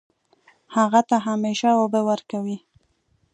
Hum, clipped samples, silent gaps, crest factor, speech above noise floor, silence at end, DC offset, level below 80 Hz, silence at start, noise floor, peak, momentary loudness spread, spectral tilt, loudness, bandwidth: none; under 0.1%; none; 18 dB; 45 dB; 0.75 s; under 0.1%; -74 dBFS; 0.7 s; -66 dBFS; -4 dBFS; 10 LU; -5.5 dB/octave; -21 LUFS; 9.6 kHz